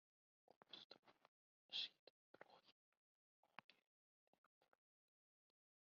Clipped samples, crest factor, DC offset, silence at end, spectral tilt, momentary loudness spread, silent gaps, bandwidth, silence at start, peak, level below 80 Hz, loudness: under 0.1%; 28 dB; under 0.1%; 2.25 s; 2.5 dB/octave; 19 LU; 0.84-0.90 s, 0.99-1.03 s, 1.28-1.69 s, 1.99-2.34 s, 2.72-3.43 s, 3.64-3.69 s; 6.4 kHz; 0.7 s; -36 dBFS; under -90 dBFS; -53 LUFS